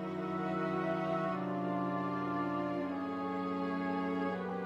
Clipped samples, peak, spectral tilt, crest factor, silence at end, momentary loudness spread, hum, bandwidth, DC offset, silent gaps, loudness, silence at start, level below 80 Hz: under 0.1%; -22 dBFS; -8 dB/octave; 12 dB; 0 s; 3 LU; none; 7.8 kHz; under 0.1%; none; -36 LUFS; 0 s; -78 dBFS